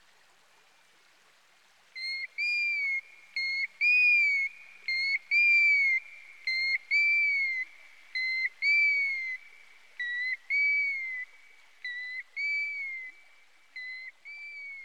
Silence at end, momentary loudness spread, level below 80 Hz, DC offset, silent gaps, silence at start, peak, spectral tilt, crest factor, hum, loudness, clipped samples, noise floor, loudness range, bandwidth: 0 s; 19 LU; under -90 dBFS; 0.1%; none; 1.95 s; -18 dBFS; 3.5 dB/octave; 14 dB; none; -26 LUFS; under 0.1%; -63 dBFS; 9 LU; 11.5 kHz